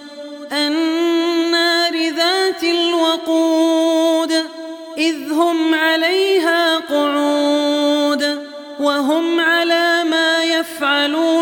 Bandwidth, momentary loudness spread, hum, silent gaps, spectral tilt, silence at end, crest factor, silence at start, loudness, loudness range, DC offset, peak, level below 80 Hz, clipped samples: 17.5 kHz; 5 LU; none; none; -1 dB/octave; 0 s; 12 dB; 0 s; -16 LUFS; 1 LU; under 0.1%; -4 dBFS; -70 dBFS; under 0.1%